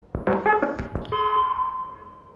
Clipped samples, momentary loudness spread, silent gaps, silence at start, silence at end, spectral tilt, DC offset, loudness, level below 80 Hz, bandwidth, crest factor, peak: under 0.1%; 13 LU; none; 0.15 s; 0.05 s; -7.5 dB/octave; under 0.1%; -24 LUFS; -44 dBFS; 7.2 kHz; 16 dB; -8 dBFS